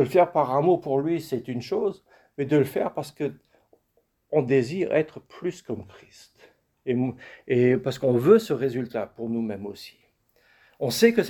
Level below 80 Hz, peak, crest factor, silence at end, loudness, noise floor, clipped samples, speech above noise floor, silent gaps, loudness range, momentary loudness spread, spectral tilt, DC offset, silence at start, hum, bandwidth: -64 dBFS; -4 dBFS; 22 dB; 0 s; -25 LUFS; -70 dBFS; under 0.1%; 46 dB; none; 4 LU; 16 LU; -6.5 dB/octave; under 0.1%; 0 s; none; 19 kHz